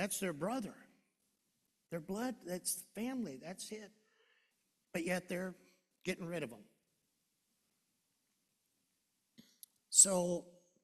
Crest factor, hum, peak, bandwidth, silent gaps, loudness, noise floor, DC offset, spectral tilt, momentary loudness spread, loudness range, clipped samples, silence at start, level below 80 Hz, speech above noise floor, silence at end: 30 dB; none; -12 dBFS; 14 kHz; none; -36 LUFS; -83 dBFS; under 0.1%; -2.5 dB/octave; 20 LU; 14 LU; under 0.1%; 0 s; -78 dBFS; 45 dB; 0.35 s